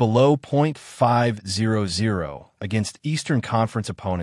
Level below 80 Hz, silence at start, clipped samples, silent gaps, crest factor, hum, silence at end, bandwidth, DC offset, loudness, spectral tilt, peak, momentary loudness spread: -56 dBFS; 0 s; under 0.1%; none; 16 dB; none; 0 s; 12 kHz; under 0.1%; -22 LUFS; -6 dB/octave; -6 dBFS; 9 LU